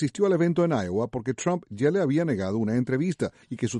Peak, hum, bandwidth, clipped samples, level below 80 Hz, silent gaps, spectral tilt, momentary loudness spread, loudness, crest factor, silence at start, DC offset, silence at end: -10 dBFS; none; 11.5 kHz; under 0.1%; -62 dBFS; none; -7 dB/octave; 7 LU; -26 LUFS; 14 dB; 0 s; under 0.1%; 0 s